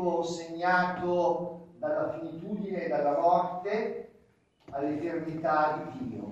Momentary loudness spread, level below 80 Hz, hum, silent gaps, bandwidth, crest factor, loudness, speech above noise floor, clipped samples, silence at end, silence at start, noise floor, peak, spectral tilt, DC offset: 12 LU; -68 dBFS; none; none; 8.4 kHz; 18 dB; -30 LUFS; 35 dB; under 0.1%; 0 s; 0 s; -65 dBFS; -14 dBFS; -6.5 dB/octave; under 0.1%